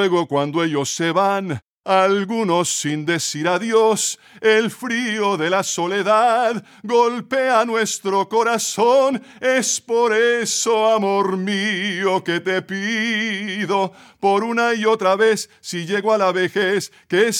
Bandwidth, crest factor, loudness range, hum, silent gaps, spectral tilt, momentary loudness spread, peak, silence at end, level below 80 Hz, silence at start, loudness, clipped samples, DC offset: 16.5 kHz; 14 dB; 2 LU; none; 1.66-1.82 s; -3.5 dB/octave; 6 LU; -4 dBFS; 0 s; -74 dBFS; 0 s; -19 LUFS; under 0.1%; under 0.1%